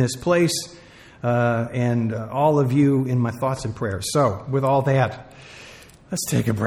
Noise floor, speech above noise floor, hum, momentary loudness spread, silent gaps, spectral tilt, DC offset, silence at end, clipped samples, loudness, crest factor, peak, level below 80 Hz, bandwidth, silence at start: -45 dBFS; 24 dB; none; 13 LU; none; -6 dB/octave; under 0.1%; 0 s; under 0.1%; -21 LUFS; 16 dB; -6 dBFS; -52 dBFS; 16 kHz; 0 s